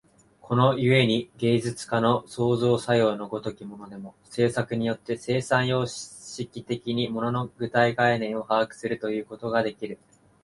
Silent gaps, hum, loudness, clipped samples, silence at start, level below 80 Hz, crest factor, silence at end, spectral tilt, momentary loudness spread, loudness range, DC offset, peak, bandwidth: none; none; -25 LUFS; under 0.1%; 0.45 s; -60 dBFS; 20 dB; 0.5 s; -6 dB/octave; 15 LU; 4 LU; under 0.1%; -6 dBFS; 11.5 kHz